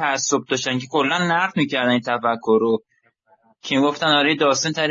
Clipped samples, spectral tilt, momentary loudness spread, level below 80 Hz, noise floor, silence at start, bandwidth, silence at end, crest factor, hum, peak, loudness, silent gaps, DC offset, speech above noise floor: under 0.1%; -3.5 dB/octave; 5 LU; -70 dBFS; -60 dBFS; 0 s; 7.6 kHz; 0 s; 16 dB; none; -4 dBFS; -19 LUFS; none; under 0.1%; 41 dB